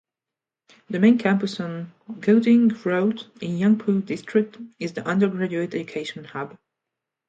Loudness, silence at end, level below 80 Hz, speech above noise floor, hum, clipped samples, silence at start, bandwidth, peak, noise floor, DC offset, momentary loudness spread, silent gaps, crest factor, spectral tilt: -22 LUFS; 0.8 s; -70 dBFS; 66 dB; none; under 0.1%; 0.9 s; 7.8 kHz; -6 dBFS; -88 dBFS; under 0.1%; 15 LU; none; 18 dB; -7.5 dB/octave